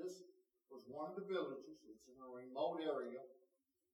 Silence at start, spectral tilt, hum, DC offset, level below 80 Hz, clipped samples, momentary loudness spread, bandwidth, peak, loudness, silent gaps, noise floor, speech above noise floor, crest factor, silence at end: 0 s; -5.5 dB/octave; none; under 0.1%; under -90 dBFS; under 0.1%; 19 LU; 14.5 kHz; -30 dBFS; -47 LUFS; none; -83 dBFS; 37 dB; 18 dB; 0.55 s